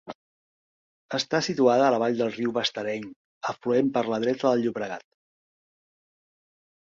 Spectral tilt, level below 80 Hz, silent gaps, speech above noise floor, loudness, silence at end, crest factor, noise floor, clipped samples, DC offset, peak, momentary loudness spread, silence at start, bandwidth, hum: -5 dB/octave; -70 dBFS; 0.15-1.09 s, 3.16-3.41 s; over 65 dB; -25 LUFS; 1.85 s; 20 dB; under -90 dBFS; under 0.1%; under 0.1%; -6 dBFS; 14 LU; 0.05 s; 7.6 kHz; none